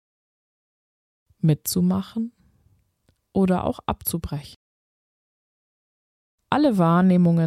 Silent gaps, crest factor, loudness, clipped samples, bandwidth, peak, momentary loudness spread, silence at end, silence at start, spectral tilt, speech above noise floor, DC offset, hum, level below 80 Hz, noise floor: 4.56-6.38 s; 18 dB; -22 LUFS; under 0.1%; 15 kHz; -6 dBFS; 13 LU; 0 s; 1.45 s; -6.5 dB/octave; 47 dB; under 0.1%; none; -50 dBFS; -67 dBFS